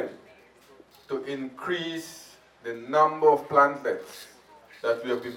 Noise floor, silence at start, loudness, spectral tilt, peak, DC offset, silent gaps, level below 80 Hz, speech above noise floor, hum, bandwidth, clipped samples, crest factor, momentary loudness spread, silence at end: -55 dBFS; 0 s; -26 LUFS; -4.5 dB/octave; -6 dBFS; under 0.1%; none; -74 dBFS; 29 dB; none; 16.5 kHz; under 0.1%; 22 dB; 21 LU; 0 s